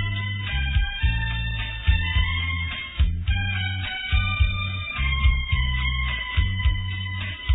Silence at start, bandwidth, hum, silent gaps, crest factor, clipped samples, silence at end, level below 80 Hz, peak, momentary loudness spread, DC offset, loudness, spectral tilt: 0 s; 4 kHz; none; none; 16 dB; under 0.1%; 0 s; -26 dBFS; -8 dBFS; 5 LU; under 0.1%; -25 LUFS; -8 dB/octave